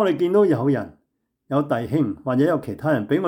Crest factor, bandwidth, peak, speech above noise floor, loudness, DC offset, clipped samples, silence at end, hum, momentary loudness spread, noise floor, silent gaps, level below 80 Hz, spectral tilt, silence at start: 14 dB; 16 kHz; -8 dBFS; 52 dB; -21 LUFS; under 0.1%; under 0.1%; 0 s; none; 7 LU; -72 dBFS; none; -62 dBFS; -8.5 dB/octave; 0 s